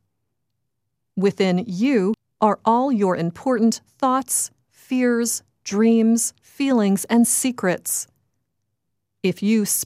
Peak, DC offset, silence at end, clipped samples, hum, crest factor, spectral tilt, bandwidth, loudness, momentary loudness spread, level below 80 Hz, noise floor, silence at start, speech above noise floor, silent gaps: -2 dBFS; under 0.1%; 0 s; under 0.1%; none; 18 dB; -4.5 dB/octave; 16 kHz; -20 LUFS; 8 LU; -68 dBFS; -79 dBFS; 1.15 s; 59 dB; none